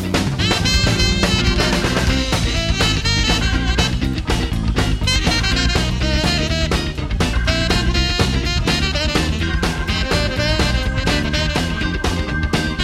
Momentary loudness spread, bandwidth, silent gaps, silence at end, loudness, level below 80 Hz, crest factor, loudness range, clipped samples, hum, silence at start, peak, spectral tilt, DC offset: 4 LU; 15.5 kHz; none; 0 s; -18 LUFS; -22 dBFS; 14 dB; 2 LU; under 0.1%; none; 0 s; -4 dBFS; -4.5 dB/octave; under 0.1%